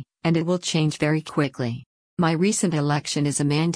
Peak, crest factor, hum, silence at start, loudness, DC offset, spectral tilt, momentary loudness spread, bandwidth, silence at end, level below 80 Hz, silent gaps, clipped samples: -8 dBFS; 14 dB; none; 0 s; -23 LUFS; under 0.1%; -5 dB/octave; 8 LU; 10.5 kHz; 0 s; -58 dBFS; 1.86-2.17 s; under 0.1%